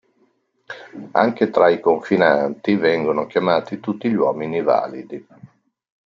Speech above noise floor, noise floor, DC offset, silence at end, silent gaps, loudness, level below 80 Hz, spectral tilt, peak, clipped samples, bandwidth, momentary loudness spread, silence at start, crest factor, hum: 44 dB; -63 dBFS; under 0.1%; 0.65 s; none; -19 LUFS; -66 dBFS; -7.5 dB/octave; -2 dBFS; under 0.1%; 7.2 kHz; 19 LU; 0.7 s; 18 dB; none